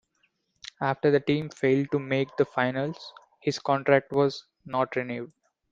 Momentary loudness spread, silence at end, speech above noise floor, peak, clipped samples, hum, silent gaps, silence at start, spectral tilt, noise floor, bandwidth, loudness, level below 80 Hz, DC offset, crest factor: 18 LU; 0.45 s; 46 dB; -6 dBFS; under 0.1%; none; none; 0.8 s; -6.5 dB/octave; -72 dBFS; 7.8 kHz; -27 LUFS; -66 dBFS; under 0.1%; 22 dB